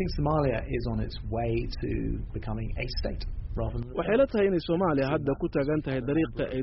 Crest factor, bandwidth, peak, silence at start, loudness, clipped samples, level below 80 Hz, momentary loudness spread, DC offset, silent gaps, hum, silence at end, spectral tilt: 16 dB; 5.8 kHz; -12 dBFS; 0 s; -29 LUFS; under 0.1%; -36 dBFS; 10 LU; under 0.1%; none; none; 0 s; -6.5 dB/octave